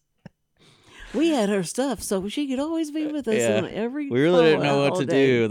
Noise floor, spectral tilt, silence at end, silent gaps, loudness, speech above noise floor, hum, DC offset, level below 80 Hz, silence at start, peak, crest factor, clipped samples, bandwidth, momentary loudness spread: -59 dBFS; -5 dB/octave; 0 s; none; -23 LUFS; 37 dB; none; under 0.1%; -56 dBFS; 1 s; -6 dBFS; 16 dB; under 0.1%; 16.5 kHz; 9 LU